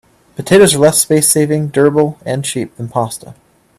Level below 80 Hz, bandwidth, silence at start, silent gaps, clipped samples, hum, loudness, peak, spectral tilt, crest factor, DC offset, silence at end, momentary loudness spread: -50 dBFS; 16 kHz; 0.4 s; none; under 0.1%; none; -12 LUFS; 0 dBFS; -4 dB/octave; 14 dB; under 0.1%; 0.45 s; 14 LU